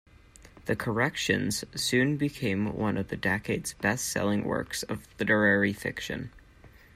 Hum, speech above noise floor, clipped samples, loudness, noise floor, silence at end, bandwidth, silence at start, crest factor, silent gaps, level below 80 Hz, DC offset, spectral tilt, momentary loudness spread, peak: none; 26 dB; under 0.1%; -28 LUFS; -54 dBFS; 0.3 s; 16 kHz; 0.4 s; 20 dB; none; -56 dBFS; under 0.1%; -4.5 dB/octave; 10 LU; -10 dBFS